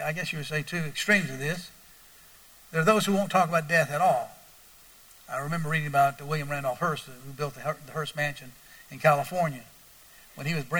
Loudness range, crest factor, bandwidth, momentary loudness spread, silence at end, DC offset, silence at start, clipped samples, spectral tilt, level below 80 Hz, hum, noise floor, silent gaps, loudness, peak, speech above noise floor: 4 LU; 22 dB; over 20 kHz; 13 LU; 0 s; under 0.1%; 0 s; under 0.1%; -5 dB/octave; -62 dBFS; none; -53 dBFS; none; -27 LUFS; -8 dBFS; 26 dB